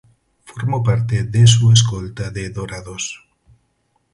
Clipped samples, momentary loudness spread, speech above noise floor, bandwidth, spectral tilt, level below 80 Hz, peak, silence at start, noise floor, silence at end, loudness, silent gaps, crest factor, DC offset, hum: under 0.1%; 17 LU; 49 dB; 11.5 kHz; -4.5 dB/octave; -42 dBFS; 0 dBFS; 0.5 s; -65 dBFS; 1 s; -17 LUFS; none; 18 dB; under 0.1%; none